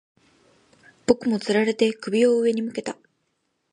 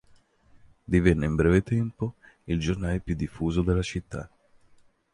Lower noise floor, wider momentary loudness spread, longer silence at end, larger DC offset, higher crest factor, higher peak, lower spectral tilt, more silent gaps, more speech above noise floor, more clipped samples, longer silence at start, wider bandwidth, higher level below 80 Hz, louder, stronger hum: first, -73 dBFS vs -59 dBFS; about the same, 13 LU vs 13 LU; about the same, 0.8 s vs 0.9 s; neither; about the same, 22 dB vs 20 dB; first, -2 dBFS vs -6 dBFS; second, -5 dB/octave vs -7.5 dB/octave; neither; first, 52 dB vs 34 dB; neither; first, 1.1 s vs 0.9 s; about the same, 11 kHz vs 11 kHz; second, -64 dBFS vs -38 dBFS; first, -22 LUFS vs -26 LUFS; neither